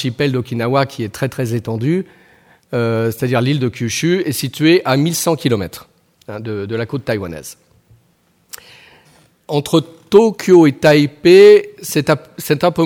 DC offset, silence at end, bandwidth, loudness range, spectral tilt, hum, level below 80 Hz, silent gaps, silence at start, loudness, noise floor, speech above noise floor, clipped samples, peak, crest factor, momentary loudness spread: under 0.1%; 0 s; 17.5 kHz; 14 LU; -5.5 dB/octave; none; -54 dBFS; none; 0 s; -15 LUFS; -57 dBFS; 43 dB; under 0.1%; 0 dBFS; 16 dB; 17 LU